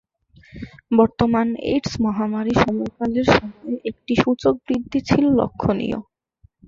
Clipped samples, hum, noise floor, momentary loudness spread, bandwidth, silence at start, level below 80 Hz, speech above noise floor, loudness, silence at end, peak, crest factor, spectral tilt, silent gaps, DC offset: under 0.1%; none; -57 dBFS; 11 LU; 7.6 kHz; 0.55 s; -44 dBFS; 38 dB; -20 LUFS; 0.65 s; -2 dBFS; 18 dB; -6.5 dB/octave; none; under 0.1%